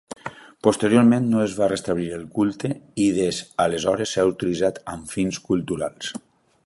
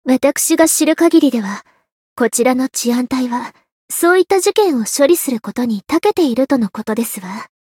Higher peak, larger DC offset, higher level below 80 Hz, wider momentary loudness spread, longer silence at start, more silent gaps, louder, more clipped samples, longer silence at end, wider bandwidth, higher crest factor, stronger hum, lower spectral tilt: about the same, -2 dBFS vs 0 dBFS; neither; first, -54 dBFS vs -60 dBFS; first, 15 LU vs 11 LU; first, 0.25 s vs 0.05 s; second, none vs 1.92-2.16 s, 3.72-3.88 s; second, -22 LUFS vs -15 LUFS; neither; first, 0.5 s vs 0.2 s; second, 11.5 kHz vs 17.5 kHz; first, 20 dB vs 14 dB; neither; first, -5.5 dB/octave vs -3.5 dB/octave